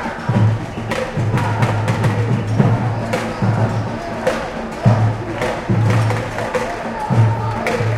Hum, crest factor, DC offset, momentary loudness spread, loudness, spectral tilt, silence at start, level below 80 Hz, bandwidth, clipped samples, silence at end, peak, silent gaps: none; 18 dB; under 0.1%; 7 LU; -18 LUFS; -7 dB/octave; 0 s; -38 dBFS; 12 kHz; under 0.1%; 0 s; 0 dBFS; none